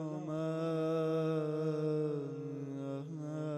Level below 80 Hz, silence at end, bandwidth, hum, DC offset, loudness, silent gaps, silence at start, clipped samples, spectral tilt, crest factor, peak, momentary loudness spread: -82 dBFS; 0 s; 8.8 kHz; none; under 0.1%; -37 LUFS; none; 0 s; under 0.1%; -8.5 dB/octave; 10 dB; -26 dBFS; 8 LU